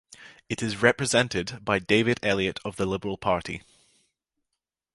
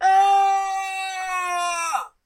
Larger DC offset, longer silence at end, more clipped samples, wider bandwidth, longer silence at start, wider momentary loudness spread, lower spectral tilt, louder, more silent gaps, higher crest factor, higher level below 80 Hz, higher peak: neither; first, 1.35 s vs 0.15 s; neither; second, 11.5 kHz vs 16 kHz; first, 0.2 s vs 0 s; about the same, 9 LU vs 10 LU; first, -4 dB/octave vs 1.5 dB/octave; second, -25 LUFS vs -21 LUFS; neither; first, 24 dB vs 12 dB; first, -54 dBFS vs -64 dBFS; first, -4 dBFS vs -8 dBFS